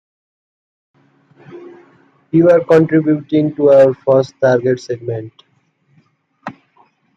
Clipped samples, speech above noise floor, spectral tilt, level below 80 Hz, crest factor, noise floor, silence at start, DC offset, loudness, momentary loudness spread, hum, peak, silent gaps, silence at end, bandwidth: under 0.1%; 47 dB; -8.5 dB/octave; -60 dBFS; 16 dB; -59 dBFS; 1.5 s; under 0.1%; -13 LUFS; 20 LU; none; 0 dBFS; none; 0.65 s; 7.6 kHz